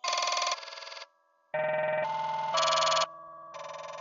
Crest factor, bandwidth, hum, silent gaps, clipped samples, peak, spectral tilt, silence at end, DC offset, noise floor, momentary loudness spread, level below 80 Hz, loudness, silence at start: 18 dB; 8 kHz; none; none; under 0.1%; -14 dBFS; -0.5 dB/octave; 0 s; under 0.1%; -65 dBFS; 19 LU; -84 dBFS; -29 LUFS; 0.05 s